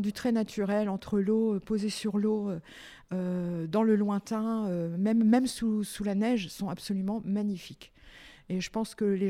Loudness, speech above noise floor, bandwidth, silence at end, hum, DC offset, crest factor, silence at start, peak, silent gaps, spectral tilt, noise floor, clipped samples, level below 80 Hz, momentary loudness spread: -30 LUFS; 24 dB; 14.5 kHz; 0 s; none; under 0.1%; 18 dB; 0 s; -12 dBFS; none; -6.5 dB/octave; -53 dBFS; under 0.1%; -60 dBFS; 10 LU